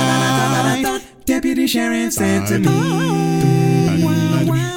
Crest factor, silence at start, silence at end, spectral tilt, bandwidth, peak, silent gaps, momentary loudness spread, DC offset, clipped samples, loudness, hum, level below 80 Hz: 14 dB; 0 s; 0 s; -5.5 dB/octave; 17 kHz; -2 dBFS; none; 4 LU; under 0.1%; under 0.1%; -16 LUFS; none; -44 dBFS